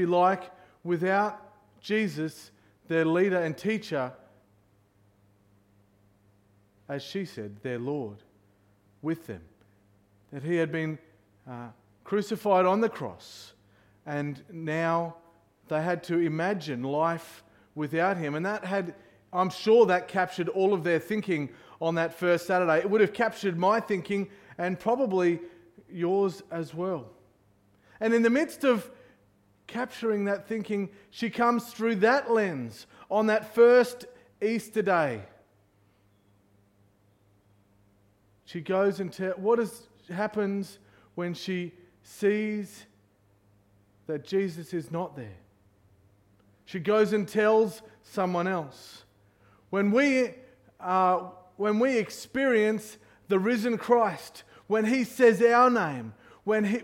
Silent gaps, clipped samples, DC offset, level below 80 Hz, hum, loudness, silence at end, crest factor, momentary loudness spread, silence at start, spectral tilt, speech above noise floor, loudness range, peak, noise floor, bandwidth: none; under 0.1%; under 0.1%; -72 dBFS; none; -27 LUFS; 0 s; 20 dB; 18 LU; 0 s; -6 dB/octave; 38 dB; 11 LU; -8 dBFS; -65 dBFS; 16.5 kHz